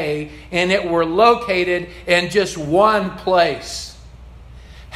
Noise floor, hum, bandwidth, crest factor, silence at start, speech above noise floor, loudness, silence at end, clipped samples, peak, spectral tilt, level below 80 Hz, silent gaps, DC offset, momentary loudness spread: -39 dBFS; none; 14.5 kHz; 18 dB; 0 s; 22 dB; -17 LUFS; 0 s; under 0.1%; 0 dBFS; -4.5 dB/octave; -42 dBFS; none; under 0.1%; 13 LU